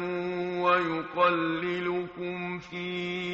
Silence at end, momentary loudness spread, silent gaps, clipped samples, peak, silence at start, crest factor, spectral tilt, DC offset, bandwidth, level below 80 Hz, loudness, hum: 0 s; 10 LU; none; under 0.1%; -12 dBFS; 0 s; 18 dB; -3.5 dB/octave; under 0.1%; 7.6 kHz; -66 dBFS; -29 LUFS; none